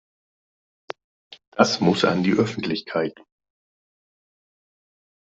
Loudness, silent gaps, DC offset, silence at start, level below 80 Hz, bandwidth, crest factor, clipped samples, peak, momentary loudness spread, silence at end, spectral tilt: -22 LUFS; 1.47-1.52 s; under 0.1%; 1.3 s; -64 dBFS; 8 kHz; 24 dB; under 0.1%; -2 dBFS; 20 LU; 2.2 s; -5.5 dB/octave